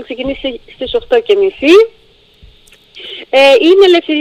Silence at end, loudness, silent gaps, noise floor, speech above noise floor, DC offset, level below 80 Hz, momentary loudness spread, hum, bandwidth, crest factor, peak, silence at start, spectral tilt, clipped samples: 0 s; -9 LUFS; none; -43 dBFS; 34 dB; under 0.1%; -42 dBFS; 18 LU; none; 11.5 kHz; 12 dB; 0 dBFS; 0 s; -3.5 dB/octave; 0.2%